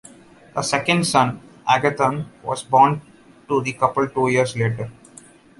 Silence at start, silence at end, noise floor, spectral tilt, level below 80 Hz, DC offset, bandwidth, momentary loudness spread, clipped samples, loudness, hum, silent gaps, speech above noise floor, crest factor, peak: 0.55 s; 0.7 s; -47 dBFS; -5 dB/octave; -56 dBFS; under 0.1%; 11.5 kHz; 13 LU; under 0.1%; -20 LUFS; none; none; 28 dB; 20 dB; -2 dBFS